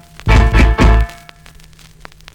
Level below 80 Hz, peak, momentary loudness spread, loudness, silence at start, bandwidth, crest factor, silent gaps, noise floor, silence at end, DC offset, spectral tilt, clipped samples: -14 dBFS; -2 dBFS; 6 LU; -12 LUFS; 0.25 s; 9.4 kHz; 10 dB; none; -40 dBFS; 1.2 s; under 0.1%; -6.5 dB/octave; under 0.1%